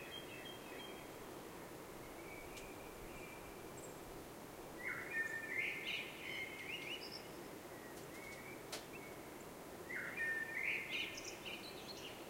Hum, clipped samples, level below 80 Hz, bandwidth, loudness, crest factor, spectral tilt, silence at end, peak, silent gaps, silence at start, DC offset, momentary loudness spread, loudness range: none; under 0.1%; -68 dBFS; 16 kHz; -46 LUFS; 18 dB; -2.5 dB/octave; 0 s; -30 dBFS; none; 0 s; under 0.1%; 12 LU; 8 LU